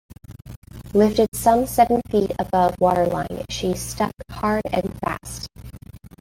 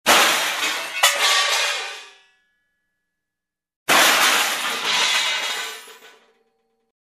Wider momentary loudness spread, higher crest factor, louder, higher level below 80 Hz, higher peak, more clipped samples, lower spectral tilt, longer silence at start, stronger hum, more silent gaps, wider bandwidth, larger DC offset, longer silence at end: first, 21 LU vs 16 LU; about the same, 18 dB vs 20 dB; second, -21 LUFS vs -17 LUFS; first, -42 dBFS vs -72 dBFS; about the same, -2 dBFS vs -2 dBFS; neither; first, -5.5 dB/octave vs 1 dB/octave; about the same, 0.1 s vs 0.05 s; neither; about the same, 0.57-0.62 s, 1.28-1.32 s vs 3.76-3.86 s; first, 17 kHz vs 14.5 kHz; neither; second, 0.15 s vs 1 s